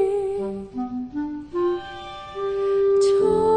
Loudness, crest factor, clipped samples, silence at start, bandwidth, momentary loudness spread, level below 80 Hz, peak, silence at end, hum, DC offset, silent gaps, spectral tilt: -23 LUFS; 12 dB; under 0.1%; 0 s; 9.6 kHz; 12 LU; -52 dBFS; -10 dBFS; 0 s; none; under 0.1%; none; -6 dB/octave